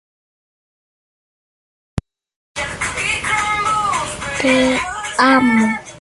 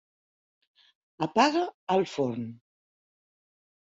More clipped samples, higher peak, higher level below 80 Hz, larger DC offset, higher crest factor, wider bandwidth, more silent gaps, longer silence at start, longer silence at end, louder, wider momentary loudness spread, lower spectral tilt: neither; first, -2 dBFS vs -8 dBFS; first, -42 dBFS vs -74 dBFS; neither; about the same, 18 dB vs 22 dB; first, 11.5 kHz vs 8 kHz; first, 2.36-2.55 s vs 1.74-1.87 s; first, 1.95 s vs 1.2 s; second, 0 s vs 1.4 s; first, -16 LUFS vs -27 LUFS; first, 17 LU vs 12 LU; second, -3.5 dB/octave vs -5 dB/octave